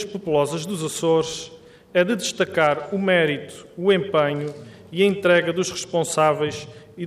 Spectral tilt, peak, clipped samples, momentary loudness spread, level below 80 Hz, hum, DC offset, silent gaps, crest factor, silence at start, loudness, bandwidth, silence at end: -4.5 dB/octave; -6 dBFS; under 0.1%; 14 LU; -62 dBFS; none; under 0.1%; none; 16 dB; 0 s; -21 LUFS; 15 kHz; 0 s